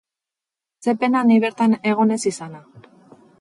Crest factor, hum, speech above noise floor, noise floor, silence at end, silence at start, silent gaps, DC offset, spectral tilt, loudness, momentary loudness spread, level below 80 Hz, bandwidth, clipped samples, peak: 14 dB; none; 69 dB; -88 dBFS; 0.6 s; 0.85 s; none; under 0.1%; -5.5 dB/octave; -19 LUFS; 11 LU; -70 dBFS; 11.5 kHz; under 0.1%; -6 dBFS